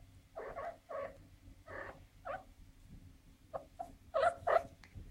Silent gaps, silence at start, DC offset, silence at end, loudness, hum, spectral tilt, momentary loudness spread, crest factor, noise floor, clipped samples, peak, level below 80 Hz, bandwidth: none; 0 s; under 0.1%; 0 s; -41 LUFS; none; -5 dB/octave; 25 LU; 24 dB; -60 dBFS; under 0.1%; -18 dBFS; -62 dBFS; 16 kHz